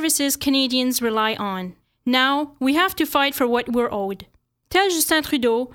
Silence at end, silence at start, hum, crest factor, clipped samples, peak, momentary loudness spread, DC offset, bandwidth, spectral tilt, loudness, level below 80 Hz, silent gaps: 0.05 s; 0 s; none; 16 dB; under 0.1%; -6 dBFS; 10 LU; under 0.1%; 19 kHz; -2 dB/octave; -20 LUFS; -54 dBFS; none